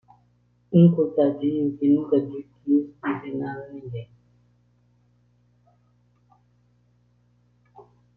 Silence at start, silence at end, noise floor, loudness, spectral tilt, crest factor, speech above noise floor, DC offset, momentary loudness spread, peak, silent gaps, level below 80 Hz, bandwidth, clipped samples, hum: 0.7 s; 0.35 s; -63 dBFS; -23 LUFS; -12 dB/octave; 22 dB; 41 dB; under 0.1%; 19 LU; -4 dBFS; none; -66 dBFS; 3.4 kHz; under 0.1%; 60 Hz at -50 dBFS